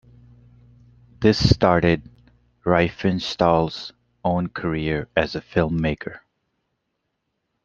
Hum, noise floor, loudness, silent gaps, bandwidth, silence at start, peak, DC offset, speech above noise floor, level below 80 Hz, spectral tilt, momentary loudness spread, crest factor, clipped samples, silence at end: none; -76 dBFS; -21 LUFS; none; 7.4 kHz; 1.2 s; -2 dBFS; under 0.1%; 56 dB; -42 dBFS; -6.5 dB/octave; 11 LU; 22 dB; under 0.1%; 1.45 s